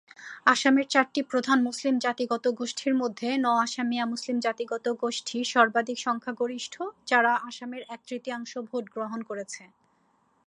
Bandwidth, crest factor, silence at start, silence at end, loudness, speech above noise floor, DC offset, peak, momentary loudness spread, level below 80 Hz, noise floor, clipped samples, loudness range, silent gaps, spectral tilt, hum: 11 kHz; 22 dB; 0.2 s; 0.8 s; -27 LUFS; 41 dB; under 0.1%; -4 dBFS; 14 LU; -82 dBFS; -68 dBFS; under 0.1%; 5 LU; none; -2.5 dB/octave; none